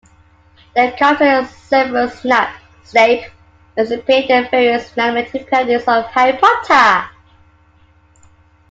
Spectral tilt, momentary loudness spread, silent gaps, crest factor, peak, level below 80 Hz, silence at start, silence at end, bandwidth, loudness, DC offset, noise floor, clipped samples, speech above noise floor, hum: -4 dB/octave; 9 LU; none; 16 dB; 0 dBFS; -52 dBFS; 0.75 s; 1.6 s; 7.8 kHz; -14 LUFS; under 0.1%; -50 dBFS; under 0.1%; 37 dB; none